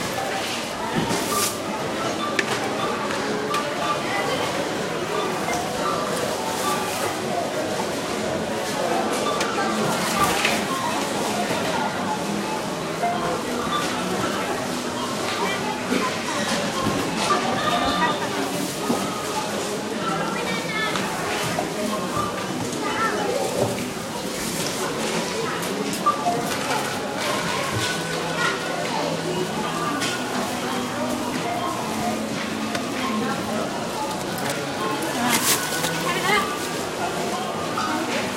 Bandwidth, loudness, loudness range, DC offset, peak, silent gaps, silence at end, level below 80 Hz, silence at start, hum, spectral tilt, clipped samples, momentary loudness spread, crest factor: 16 kHz; -24 LUFS; 2 LU; under 0.1%; -2 dBFS; none; 0 s; -54 dBFS; 0 s; none; -3.5 dB/octave; under 0.1%; 5 LU; 22 dB